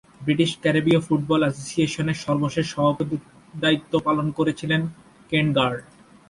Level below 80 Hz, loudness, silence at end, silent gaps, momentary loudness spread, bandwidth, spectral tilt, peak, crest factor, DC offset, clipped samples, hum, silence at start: -54 dBFS; -23 LUFS; 0.5 s; none; 6 LU; 11.5 kHz; -6 dB/octave; -6 dBFS; 16 dB; under 0.1%; under 0.1%; none; 0.2 s